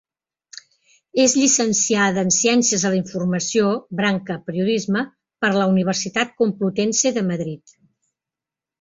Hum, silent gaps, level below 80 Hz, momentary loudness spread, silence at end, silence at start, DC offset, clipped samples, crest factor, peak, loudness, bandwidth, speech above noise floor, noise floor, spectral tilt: none; none; -62 dBFS; 9 LU; 1.25 s; 1.15 s; under 0.1%; under 0.1%; 18 dB; -4 dBFS; -19 LUFS; 8 kHz; 69 dB; -88 dBFS; -3.5 dB/octave